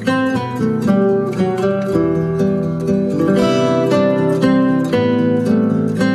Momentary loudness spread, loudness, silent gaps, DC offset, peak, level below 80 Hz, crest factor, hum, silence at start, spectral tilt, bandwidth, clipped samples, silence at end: 4 LU; -16 LUFS; none; under 0.1%; -2 dBFS; -48 dBFS; 12 dB; none; 0 s; -7.5 dB/octave; 13 kHz; under 0.1%; 0 s